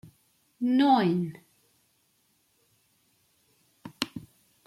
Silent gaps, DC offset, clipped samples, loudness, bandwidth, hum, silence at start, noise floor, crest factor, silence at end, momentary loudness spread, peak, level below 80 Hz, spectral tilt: none; under 0.1%; under 0.1%; -26 LUFS; 15 kHz; none; 0.6 s; -70 dBFS; 22 dB; 0.5 s; 26 LU; -8 dBFS; -72 dBFS; -6 dB/octave